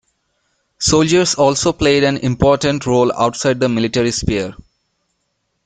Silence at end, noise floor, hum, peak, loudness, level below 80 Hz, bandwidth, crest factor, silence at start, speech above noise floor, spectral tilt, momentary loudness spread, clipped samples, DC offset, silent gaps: 1.1 s; -69 dBFS; none; 0 dBFS; -15 LUFS; -38 dBFS; 9.6 kHz; 16 dB; 0.8 s; 55 dB; -4.5 dB/octave; 6 LU; under 0.1%; under 0.1%; none